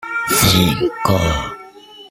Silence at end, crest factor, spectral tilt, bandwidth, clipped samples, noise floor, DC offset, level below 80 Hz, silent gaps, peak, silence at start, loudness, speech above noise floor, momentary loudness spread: 0.05 s; 18 dB; -4 dB/octave; 16.5 kHz; under 0.1%; -39 dBFS; under 0.1%; -34 dBFS; none; 0 dBFS; 0 s; -15 LUFS; 24 dB; 14 LU